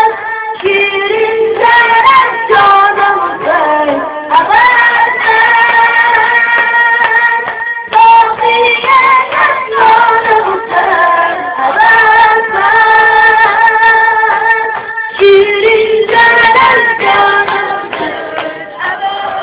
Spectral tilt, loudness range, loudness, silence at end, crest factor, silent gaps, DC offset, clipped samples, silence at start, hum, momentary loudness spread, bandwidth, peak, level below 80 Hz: -6 dB/octave; 2 LU; -7 LUFS; 0 s; 8 dB; none; under 0.1%; 2%; 0 s; none; 10 LU; 4 kHz; 0 dBFS; -48 dBFS